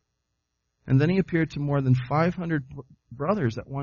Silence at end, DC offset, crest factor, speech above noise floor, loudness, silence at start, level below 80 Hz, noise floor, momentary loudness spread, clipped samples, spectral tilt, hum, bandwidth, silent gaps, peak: 0 s; under 0.1%; 16 dB; 54 dB; -25 LUFS; 0.85 s; -54 dBFS; -79 dBFS; 9 LU; under 0.1%; -7.5 dB/octave; none; 7 kHz; none; -8 dBFS